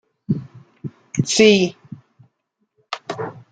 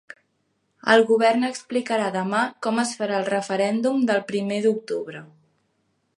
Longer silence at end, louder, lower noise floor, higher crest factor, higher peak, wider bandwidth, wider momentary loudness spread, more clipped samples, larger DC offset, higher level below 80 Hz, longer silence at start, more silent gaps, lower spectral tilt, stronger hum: second, 0.1 s vs 0.9 s; first, -19 LUFS vs -22 LUFS; about the same, -72 dBFS vs -71 dBFS; about the same, 20 dB vs 20 dB; about the same, -2 dBFS vs -2 dBFS; second, 9.4 kHz vs 11.5 kHz; first, 23 LU vs 10 LU; neither; neither; first, -62 dBFS vs -76 dBFS; second, 0.3 s vs 0.85 s; neither; about the same, -4.5 dB/octave vs -4.5 dB/octave; neither